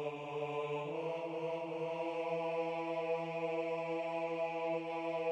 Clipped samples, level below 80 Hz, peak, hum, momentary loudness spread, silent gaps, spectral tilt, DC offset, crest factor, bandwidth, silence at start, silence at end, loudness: under 0.1%; -86 dBFS; -26 dBFS; none; 3 LU; none; -6.5 dB/octave; under 0.1%; 12 dB; 9.2 kHz; 0 s; 0 s; -39 LUFS